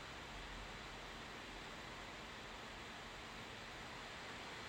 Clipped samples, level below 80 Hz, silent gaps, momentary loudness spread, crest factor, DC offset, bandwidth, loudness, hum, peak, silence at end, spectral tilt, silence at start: under 0.1%; -62 dBFS; none; 1 LU; 12 dB; under 0.1%; 16 kHz; -51 LUFS; none; -40 dBFS; 0 s; -3 dB/octave; 0 s